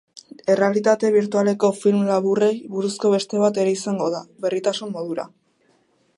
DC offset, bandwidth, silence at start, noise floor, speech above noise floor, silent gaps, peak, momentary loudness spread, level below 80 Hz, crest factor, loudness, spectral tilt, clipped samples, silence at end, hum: under 0.1%; 11.5 kHz; 0.15 s; -62 dBFS; 43 dB; none; -4 dBFS; 10 LU; -72 dBFS; 16 dB; -21 LUFS; -5.5 dB/octave; under 0.1%; 0.9 s; none